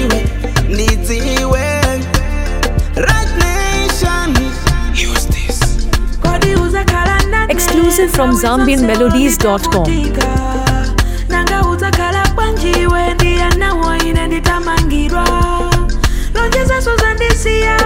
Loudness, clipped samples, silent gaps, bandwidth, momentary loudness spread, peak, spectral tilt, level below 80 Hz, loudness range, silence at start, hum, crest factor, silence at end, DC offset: -13 LUFS; under 0.1%; none; 17.5 kHz; 5 LU; 0 dBFS; -4.5 dB/octave; -16 dBFS; 3 LU; 0 s; none; 12 dB; 0 s; under 0.1%